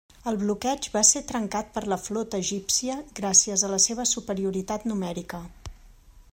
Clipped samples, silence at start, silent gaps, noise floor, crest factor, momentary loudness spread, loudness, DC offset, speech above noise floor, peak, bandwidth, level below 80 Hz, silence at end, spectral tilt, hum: under 0.1%; 0.25 s; none; -51 dBFS; 22 dB; 13 LU; -24 LUFS; under 0.1%; 25 dB; -4 dBFS; 16.5 kHz; -52 dBFS; 0.1 s; -2.5 dB/octave; none